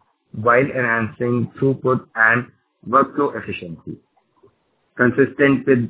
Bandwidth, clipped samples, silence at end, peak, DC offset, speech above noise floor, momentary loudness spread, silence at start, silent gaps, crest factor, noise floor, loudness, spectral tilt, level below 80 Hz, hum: 4 kHz; under 0.1%; 0 s; 0 dBFS; under 0.1%; 44 dB; 16 LU; 0.35 s; none; 18 dB; -63 dBFS; -18 LUFS; -11 dB/octave; -56 dBFS; none